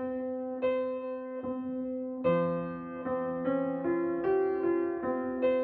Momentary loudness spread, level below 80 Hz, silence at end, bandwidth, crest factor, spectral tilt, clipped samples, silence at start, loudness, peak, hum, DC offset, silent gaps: 8 LU; -66 dBFS; 0 s; 4.5 kHz; 14 dB; -7 dB/octave; under 0.1%; 0 s; -32 LUFS; -16 dBFS; none; under 0.1%; none